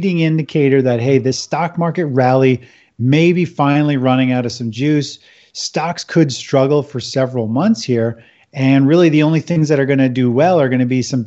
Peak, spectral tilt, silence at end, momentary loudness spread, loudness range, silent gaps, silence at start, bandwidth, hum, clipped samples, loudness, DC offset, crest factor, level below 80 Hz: 0 dBFS; -6.5 dB/octave; 0 s; 8 LU; 3 LU; none; 0 s; 8.2 kHz; none; under 0.1%; -15 LUFS; under 0.1%; 14 dB; -60 dBFS